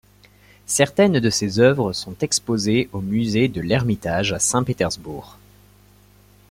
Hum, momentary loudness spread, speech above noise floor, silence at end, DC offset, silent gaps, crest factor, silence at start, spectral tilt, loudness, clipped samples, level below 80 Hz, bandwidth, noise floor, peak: 50 Hz at -40 dBFS; 8 LU; 32 dB; 1.2 s; under 0.1%; none; 18 dB; 0.7 s; -4.5 dB/octave; -20 LUFS; under 0.1%; -50 dBFS; 16.5 kHz; -52 dBFS; -2 dBFS